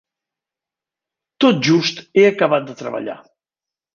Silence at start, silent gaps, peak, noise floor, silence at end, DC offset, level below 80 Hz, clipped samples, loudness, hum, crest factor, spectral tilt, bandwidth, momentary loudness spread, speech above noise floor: 1.4 s; none; -2 dBFS; -89 dBFS; 0.8 s; under 0.1%; -66 dBFS; under 0.1%; -16 LUFS; none; 18 dB; -5.5 dB/octave; 7.2 kHz; 14 LU; 73 dB